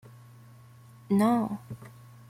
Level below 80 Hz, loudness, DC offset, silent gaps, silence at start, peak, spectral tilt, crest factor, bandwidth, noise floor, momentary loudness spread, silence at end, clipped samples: -68 dBFS; -27 LUFS; under 0.1%; none; 1.1 s; -12 dBFS; -7.5 dB/octave; 18 dB; 16 kHz; -52 dBFS; 21 LU; 0.4 s; under 0.1%